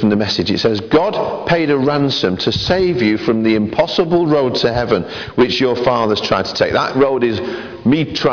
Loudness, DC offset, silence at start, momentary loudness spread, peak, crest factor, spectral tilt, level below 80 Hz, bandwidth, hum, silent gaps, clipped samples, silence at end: -15 LUFS; under 0.1%; 0 s; 4 LU; -4 dBFS; 12 dB; -6 dB/octave; -42 dBFS; 5.4 kHz; none; none; under 0.1%; 0 s